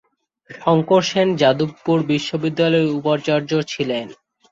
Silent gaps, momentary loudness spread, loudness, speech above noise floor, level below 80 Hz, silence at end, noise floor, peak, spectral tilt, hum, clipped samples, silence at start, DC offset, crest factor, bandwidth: none; 8 LU; -19 LUFS; 28 dB; -60 dBFS; 0.4 s; -46 dBFS; -2 dBFS; -6 dB/octave; none; under 0.1%; 0.5 s; under 0.1%; 18 dB; 7.8 kHz